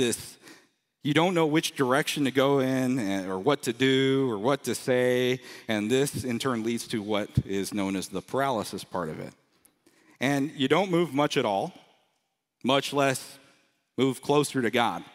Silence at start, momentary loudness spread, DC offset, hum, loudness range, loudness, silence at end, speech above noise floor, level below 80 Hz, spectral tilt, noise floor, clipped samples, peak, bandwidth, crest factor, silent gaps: 0 s; 10 LU; under 0.1%; none; 5 LU; -27 LUFS; 0.05 s; 52 dB; -58 dBFS; -5 dB/octave; -78 dBFS; under 0.1%; -8 dBFS; 16 kHz; 20 dB; none